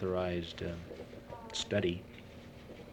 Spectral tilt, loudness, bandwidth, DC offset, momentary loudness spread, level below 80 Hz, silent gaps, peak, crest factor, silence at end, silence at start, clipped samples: -5 dB/octave; -38 LUFS; 18.5 kHz; under 0.1%; 18 LU; -58 dBFS; none; -18 dBFS; 20 dB; 0 s; 0 s; under 0.1%